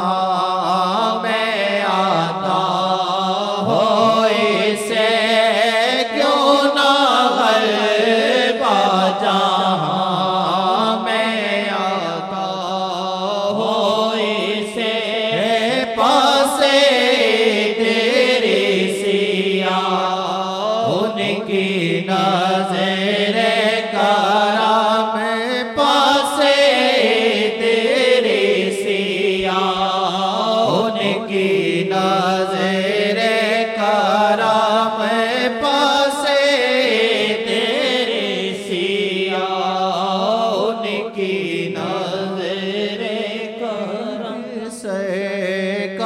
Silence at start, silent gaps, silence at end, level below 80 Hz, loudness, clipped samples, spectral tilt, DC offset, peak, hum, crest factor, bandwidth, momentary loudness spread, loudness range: 0 s; none; 0 s; -62 dBFS; -17 LUFS; under 0.1%; -4 dB/octave; under 0.1%; 0 dBFS; none; 16 dB; 16 kHz; 8 LU; 5 LU